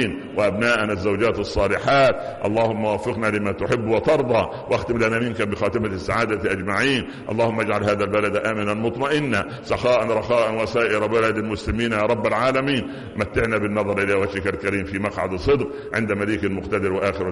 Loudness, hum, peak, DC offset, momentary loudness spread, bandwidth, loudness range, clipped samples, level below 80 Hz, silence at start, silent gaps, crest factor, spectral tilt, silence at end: -21 LUFS; none; -8 dBFS; under 0.1%; 5 LU; 11.5 kHz; 2 LU; under 0.1%; -42 dBFS; 0 s; none; 12 dB; -6 dB/octave; 0 s